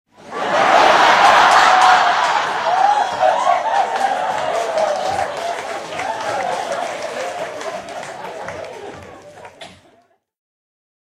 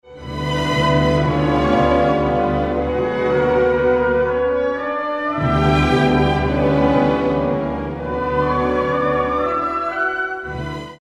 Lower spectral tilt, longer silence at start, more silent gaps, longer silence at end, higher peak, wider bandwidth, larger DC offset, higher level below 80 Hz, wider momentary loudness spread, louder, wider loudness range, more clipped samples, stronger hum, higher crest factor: second, -1.5 dB/octave vs -7 dB/octave; first, 0.2 s vs 0.05 s; neither; first, 1.35 s vs 0.05 s; about the same, 0 dBFS vs -2 dBFS; first, 15 kHz vs 10.5 kHz; neither; second, -58 dBFS vs -32 dBFS; first, 19 LU vs 8 LU; first, -15 LUFS vs -18 LUFS; first, 18 LU vs 2 LU; neither; neither; about the same, 18 dB vs 14 dB